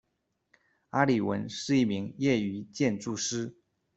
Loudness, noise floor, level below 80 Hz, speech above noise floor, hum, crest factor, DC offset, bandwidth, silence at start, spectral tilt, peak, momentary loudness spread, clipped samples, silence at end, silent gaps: -29 LUFS; -79 dBFS; -66 dBFS; 51 dB; none; 22 dB; under 0.1%; 8.2 kHz; 0.95 s; -5 dB/octave; -8 dBFS; 8 LU; under 0.1%; 0.45 s; none